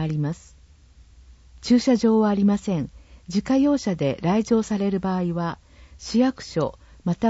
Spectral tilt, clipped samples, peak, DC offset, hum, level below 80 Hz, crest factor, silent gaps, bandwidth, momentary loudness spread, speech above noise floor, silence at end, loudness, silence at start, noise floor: -7 dB/octave; under 0.1%; -8 dBFS; under 0.1%; none; -50 dBFS; 14 dB; none; 8 kHz; 12 LU; 29 dB; 0 s; -23 LUFS; 0 s; -51 dBFS